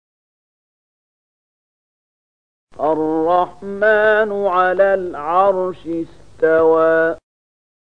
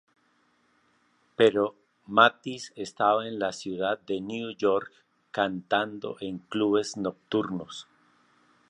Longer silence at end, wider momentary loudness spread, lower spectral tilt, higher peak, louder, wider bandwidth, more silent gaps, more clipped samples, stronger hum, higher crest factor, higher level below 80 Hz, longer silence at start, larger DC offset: about the same, 0.8 s vs 0.9 s; second, 12 LU vs 15 LU; first, -7 dB/octave vs -4.5 dB/octave; about the same, -2 dBFS vs -2 dBFS; first, -16 LUFS vs -27 LUFS; second, 6.6 kHz vs 10.5 kHz; neither; neither; first, 50 Hz at -55 dBFS vs none; second, 16 dB vs 26 dB; first, -56 dBFS vs -70 dBFS; first, 2.8 s vs 1.4 s; first, 0.8% vs under 0.1%